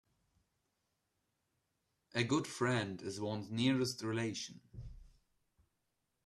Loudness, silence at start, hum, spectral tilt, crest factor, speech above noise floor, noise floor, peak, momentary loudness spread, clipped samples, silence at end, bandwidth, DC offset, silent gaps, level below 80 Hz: -37 LUFS; 2.15 s; none; -5 dB/octave; 22 dB; 47 dB; -84 dBFS; -18 dBFS; 20 LU; under 0.1%; 1.2 s; 13 kHz; under 0.1%; none; -64 dBFS